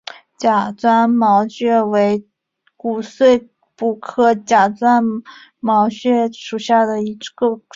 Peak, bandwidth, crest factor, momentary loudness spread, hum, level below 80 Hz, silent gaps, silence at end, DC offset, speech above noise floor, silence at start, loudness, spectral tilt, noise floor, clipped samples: -2 dBFS; 7.6 kHz; 14 dB; 10 LU; none; -62 dBFS; none; 0.15 s; under 0.1%; 39 dB; 0.4 s; -16 LUFS; -5.5 dB/octave; -55 dBFS; under 0.1%